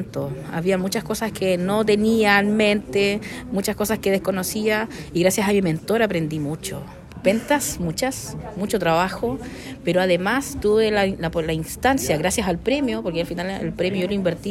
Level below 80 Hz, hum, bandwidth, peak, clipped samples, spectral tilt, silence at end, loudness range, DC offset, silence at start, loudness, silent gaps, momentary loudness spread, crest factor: -44 dBFS; none; 16.5 kHz; -4 dBFS; under 0.1%; -4.5 dB/octave; 0 s; 3 LU; under 0.1%; 0 s; -22 LUFS; none; 9 LU; 18 dB